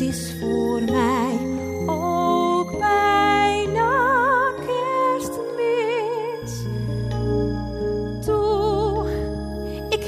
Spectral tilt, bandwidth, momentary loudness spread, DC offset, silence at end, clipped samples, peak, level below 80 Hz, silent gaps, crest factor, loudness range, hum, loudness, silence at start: -5.5 dB/octave; 15.5 kHz; 9 LU; under 0.1%; 0 s; under 0.1%; -6 dBFS; -38 dBFS; none; 16 dB; 5 LU; none; -22 LUFS; 0 s